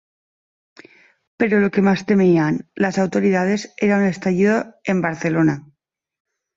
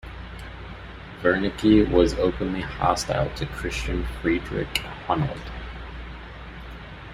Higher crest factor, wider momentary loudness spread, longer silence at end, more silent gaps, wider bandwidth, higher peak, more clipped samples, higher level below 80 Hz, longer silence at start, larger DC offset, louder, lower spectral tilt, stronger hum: second, 14 dB vs 20 dB; second, 6 LU vs 20 LU; first, 0.95 s vs 0 s; neither; second, 7.8 kHz vs 14.5 kHz; about the same, -4 dBFS vs -4 dBFS; neither; second, -58 dBFS vs -36 dBFS; first, 1.4 s vs 0.05 s; neither; first, -18 LUFS vs -24 LUFS; first, -7 dB/octave vs -5.5 dB/octave; neither